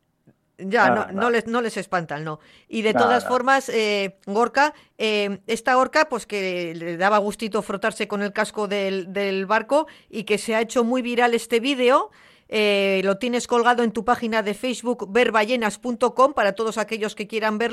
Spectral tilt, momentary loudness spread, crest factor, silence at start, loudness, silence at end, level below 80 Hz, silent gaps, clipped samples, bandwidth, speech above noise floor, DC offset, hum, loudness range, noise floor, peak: -4 dB/octave; 8 LU; 18 dB; 0.6 s; -22 LUFS; 0 s; -62 dBFS; none; under 0.1%; 13.5 kHz; 39 dB; under 0.1%; none; 3 LU; -60 dBFS; -4 dBFS